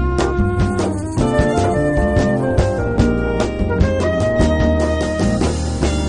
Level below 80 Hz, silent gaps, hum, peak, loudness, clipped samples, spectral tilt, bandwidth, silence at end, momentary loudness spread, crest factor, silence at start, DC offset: -22 dBFS; none; none; 0 dBFS; -17 LUFS; under 0.1%; -6.5 dB/octave; 10.5 kHz; 0 s; 3 LU; 16 dB; 0 s; under 0.1%